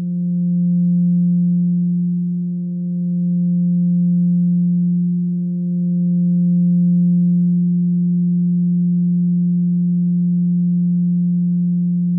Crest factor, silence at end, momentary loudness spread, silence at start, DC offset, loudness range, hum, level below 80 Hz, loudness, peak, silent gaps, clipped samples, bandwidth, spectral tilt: 6 dB; 0 s; 5 LU; 0 s; under 0.1%; 2 LU; none; -86 dBFS; -17 LUFS; -10 dBFS; none; under 0.1%; 0.6 kHz; -17.5 dB/octave